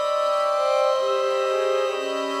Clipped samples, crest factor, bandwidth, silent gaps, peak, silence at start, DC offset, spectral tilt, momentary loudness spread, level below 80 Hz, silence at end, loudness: under 0.1%; 12 dB; 14 kHz; none; -10 dBFS; 0 s; under 0.1%; -1 dB/octave; 4 LU; -84 dBFS; 0 s; -22 LUFS